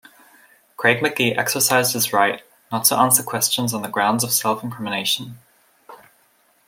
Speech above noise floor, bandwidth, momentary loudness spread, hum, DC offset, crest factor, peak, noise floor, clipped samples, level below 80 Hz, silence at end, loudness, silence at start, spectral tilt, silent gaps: 40 dB; 16.5 kHz; 9 LU; none; under 0.1%; 22 dB; 0 dBFS; -60 dBFS; under 0.1%; -66 dBFS; 0.7 s; -19 LUFS; 0.8 s; -2.5 dB/octave; none